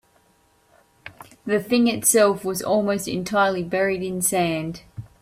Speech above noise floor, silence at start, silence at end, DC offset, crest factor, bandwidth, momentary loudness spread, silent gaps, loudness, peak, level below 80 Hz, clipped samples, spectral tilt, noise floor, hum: 40 dB; 1.05 s; 0.15 s; under 0.1%; 18 dB; 16 kHz; 20 LU; none; -21 LUFS; -4 dBFS; -58 dBFS; under 0.1%; -4 dB/octave; -61 dBFS; none